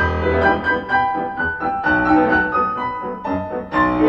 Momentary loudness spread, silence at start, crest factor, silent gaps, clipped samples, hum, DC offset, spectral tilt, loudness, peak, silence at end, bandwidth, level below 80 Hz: 9 LU; 0 s; 16 dB; none; under 0.1%; none; under 0.1%; -8 dB/octave; -18 LUFS; -2 dBFS; 0 s; 6.6 kHz; -36 dBFS